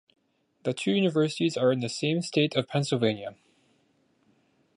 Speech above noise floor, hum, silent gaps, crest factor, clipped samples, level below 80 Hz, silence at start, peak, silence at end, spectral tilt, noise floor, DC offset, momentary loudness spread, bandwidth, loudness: 42 dB; none; none; 20 dB; under 0.1%; -72 dBFS; 0.65 s; -10 dBFS; 1.45 s; -5.5 dB/octave; -68 dBFS; under 0.1%; 9 LU; 11.5 kHz; -27 LUFS